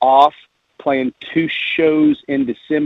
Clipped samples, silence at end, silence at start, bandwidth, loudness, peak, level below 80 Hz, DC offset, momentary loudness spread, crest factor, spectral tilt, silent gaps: under 0.1%; 0 s; 0 s; 5.8 kHz; -17 LUFS; 0 dBFS; -58 dBFS; under 0.1%; 7 LU; 16 dB; -7 dB/octave; none